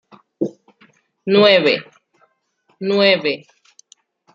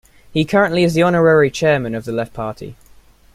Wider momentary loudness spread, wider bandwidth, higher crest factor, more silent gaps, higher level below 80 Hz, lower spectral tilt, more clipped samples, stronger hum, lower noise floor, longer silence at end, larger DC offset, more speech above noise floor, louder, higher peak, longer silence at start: about the same, 15 LU vs 14 LU; second, 7.6 kHz vs 15 kHz; about the same, 18 dB vs 16 dB; neither; second, -72 dBFS vs -46 dBFS; about the same, -5.5 dB/octave vs -6 dB/octave; neither; neither; first, -63 dBFS vs -47 dBFS; first, 0.95 s vs 0.6 s; neither; first, 49 dB vs 31 dB; about the same, -16 LUFS vs -16 LUFS; about the same, -2 dBFS vs -2 dBFS; about the same, 0.4 s vs 0.35 s